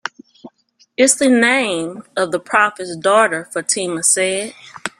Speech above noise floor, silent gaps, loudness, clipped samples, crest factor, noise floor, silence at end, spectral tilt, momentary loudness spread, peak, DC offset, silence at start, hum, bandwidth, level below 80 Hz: 40 dB; none; -16 LUFS; under 0.1%; 18 dB; -56 dBFS; 0.1 s; -2 dB/octave; 12 LU; 0 dBFS; under 0.1%; 0.05 s; none; 16 kHz; -64 dBFS